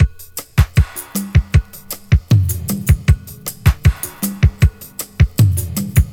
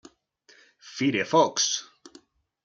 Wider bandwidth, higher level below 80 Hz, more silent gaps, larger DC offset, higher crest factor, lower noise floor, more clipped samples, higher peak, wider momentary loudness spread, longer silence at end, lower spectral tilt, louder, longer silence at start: first, 19 kHz vs 10 kHz; first, -20 dBFS vs -78 dBFS; neither; neither; second, 14 dB vs 20 dB; second, -32 dBFS vs -60 dBFS; neither; first, 0 dBFS vs -8 dBFS; about the same, 11 LU vs 10 LU; second, 0 s vs 0.85 s; first, -5.5 dB/octave vs -3 dB/octave; first, -16 LUFS vs -24 LUFS; second, 0 s vs 0.85 s